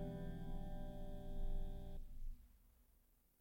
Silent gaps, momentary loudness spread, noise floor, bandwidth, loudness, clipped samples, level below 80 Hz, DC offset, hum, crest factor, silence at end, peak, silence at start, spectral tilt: none; 8 LU; -74 dBFS; 16 kHz; -53 LUFS; under 0.1%; -48 dBFS; under 0.1%; none; 12 dB; 0.7 s; -34 dBFS; 0 s; -8 dB/octave